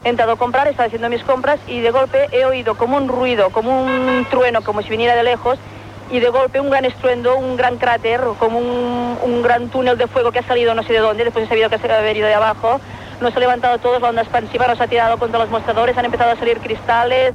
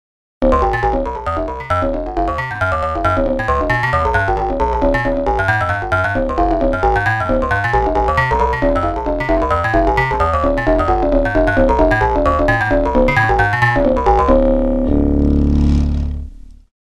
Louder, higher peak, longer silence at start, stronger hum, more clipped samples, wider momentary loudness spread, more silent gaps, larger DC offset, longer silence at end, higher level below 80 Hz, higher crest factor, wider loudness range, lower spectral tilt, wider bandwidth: about the same, -16 LUFS vs -15 LUFS; second, -4 dBFS vs 0 dBFS; second, 0.05 s vs 0.4 s; neither; neither; about the same, 4 LU vs 6 LU; neither; second, under 0.1% vs 0.2%; second, 0 s vs 0.4 s; second, -46 dBFS vs -22 dBFS; about the same, 12 dB vs 14 dB; about the same, 1 LU vs 3 LU; second, -5.5 dB/octave vs -7.5 dB/octave; about the same, 10.5 kHz vs 11 kHz